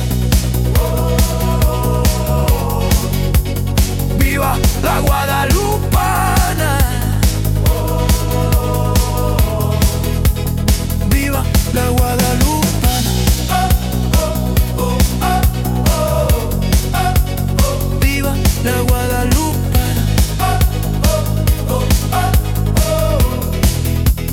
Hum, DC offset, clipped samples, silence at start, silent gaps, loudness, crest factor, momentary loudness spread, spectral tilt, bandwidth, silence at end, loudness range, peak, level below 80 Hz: none; under 0.1%; under 0.1%; 0 s; none; -15 LUFS; 12 dB; 2 LU; -5 dB/octave; 18 kHz; 0 s; 1 LU; -2 dBFS; -18 dBFS